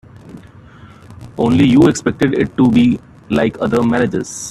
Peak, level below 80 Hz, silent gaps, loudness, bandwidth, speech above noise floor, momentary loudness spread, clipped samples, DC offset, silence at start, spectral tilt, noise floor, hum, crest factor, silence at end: 0 dBFS; -44 dBFS; none; -14 LUFS; 12.5 kHz; 26 dB; 10 LU; under 0.1%; under 0.1%; 0.25 s; -6 dB/octave; -39 dBFS; none; 14 dB; 0 s